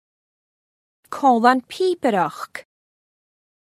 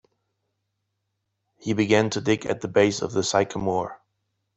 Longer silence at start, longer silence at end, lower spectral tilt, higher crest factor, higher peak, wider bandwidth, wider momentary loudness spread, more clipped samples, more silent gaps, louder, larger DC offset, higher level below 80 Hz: second, 1.1 s vs 1.65 s; first, 1.05 s vs 0.6 s; about the same, -5 dB/octave vs -4.5 dB/octave; about the same, 22 dB vs 22 dB; first, 0 dBFS vs -4 dBFS; first, 14.5 kHz vs 8.4 kHz; first, 19 LU vs 8 LU; neither; neither; first, -19 LUFS vs -23 LUFS; neither; second, -76 dBFS vs -60 dBFS